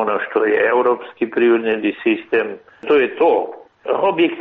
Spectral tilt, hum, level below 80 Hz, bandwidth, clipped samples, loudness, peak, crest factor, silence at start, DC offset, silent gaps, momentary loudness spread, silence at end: -2.5 dB/octave; none; -64 dBFS; 4.2 kHz; under 0.1%; -17 LUFS; -4 dBFS; 12 dB; 0 s; under 0.1%; none; 8 LU; 0 s